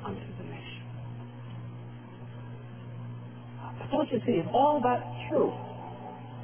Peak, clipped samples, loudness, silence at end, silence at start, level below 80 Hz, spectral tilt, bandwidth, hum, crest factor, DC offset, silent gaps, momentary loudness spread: -12 dBFS; under 0.1%; -31 LUFS; 0 s; 0 s; -62 dBFS; -6 dB/octave; 3.5 kHz; none; 20 dB; 0.1%; none; 19 LU